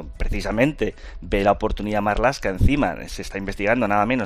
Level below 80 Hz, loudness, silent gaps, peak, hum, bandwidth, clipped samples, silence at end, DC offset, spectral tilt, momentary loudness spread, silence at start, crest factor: -30 dBFS; -22 LUFS; none; -4 dBFS; none; 14.5 kHz; under 0.1%; 0 s; under 0.1%; -6.5 dB/octave; 10 LU; 0 s; 18 dB